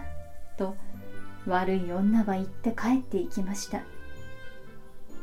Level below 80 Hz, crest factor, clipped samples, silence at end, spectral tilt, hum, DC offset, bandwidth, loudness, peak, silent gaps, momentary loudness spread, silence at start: -48 dBFS; 16 dB; under 0.1%; 0 s; -6 dB/octave; none; under 0.1%; 15.5 kHz; -29 LUFS; -14 dBFS; none; 21 LU; 0 s